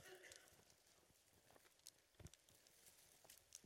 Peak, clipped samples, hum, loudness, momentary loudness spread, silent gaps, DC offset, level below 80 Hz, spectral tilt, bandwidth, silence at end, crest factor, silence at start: -38 dBFS; under 0.1%; none; -66 LUFS; 6 LU; none; under 0.1%; -82 dBFS; -2 dB/octave; 16.5 kHz; 0 s; 30 dB; 0 s